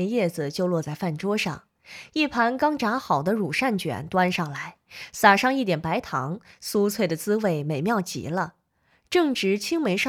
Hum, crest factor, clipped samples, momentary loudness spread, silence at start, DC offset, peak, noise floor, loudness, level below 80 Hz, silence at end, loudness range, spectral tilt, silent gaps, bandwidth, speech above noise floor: none; 24 dB; under 0.1%; 11 LU; 0 s; under 0.1%; -2 dBFS; -66 dBFS; -24 LUFS; -62 dBFS; 0 s; 3 LU; -5 dB/octave; none; 18 kHz; 42 dB